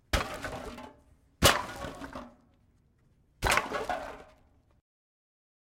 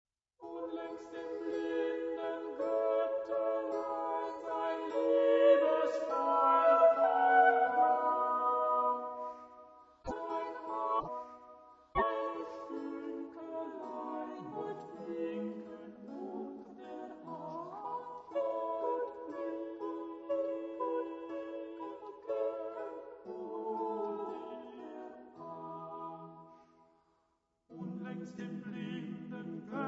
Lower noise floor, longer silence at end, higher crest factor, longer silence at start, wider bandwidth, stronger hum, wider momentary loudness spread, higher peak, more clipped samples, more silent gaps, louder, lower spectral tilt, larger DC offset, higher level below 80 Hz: second, -66 dBFS vs -79 dBFS; first, 1.5 s vs 0 s; first, 26 dB vs 20 dB; second, 0.15 s vs 0.4 s; first, 16.5 kHz vs 7.6 kHz; neither; about the same, 22 LU vs 20 LU; first, -8 dBFS vs -14 dBFS; neither; neither; first, -30 LUFS vs -35 LUFS; second, -2.5 dB/octave vs -4 dB/octave; neither; first, -46 dBFS vs -68 dBFS